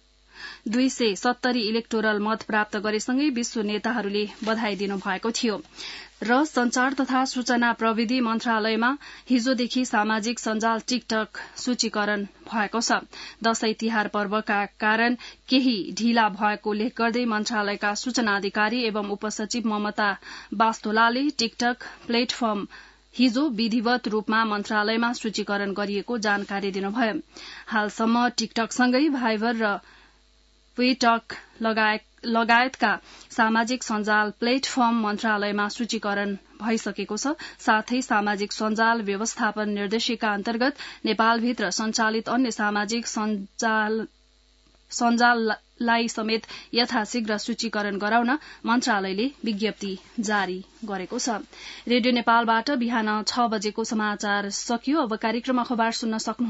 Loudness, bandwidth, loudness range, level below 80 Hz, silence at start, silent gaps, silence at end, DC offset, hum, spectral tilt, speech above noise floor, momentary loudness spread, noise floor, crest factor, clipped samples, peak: -24 LUFS; 8 kHz; 2 LU; -62 dBFS; 0.35 s; none; 0 s; under 0.1%; none; -3.5 dB/octave; 35 dB; 7 LU; -59 dBFS; 20 dB; under 0.1%; -6 dBFS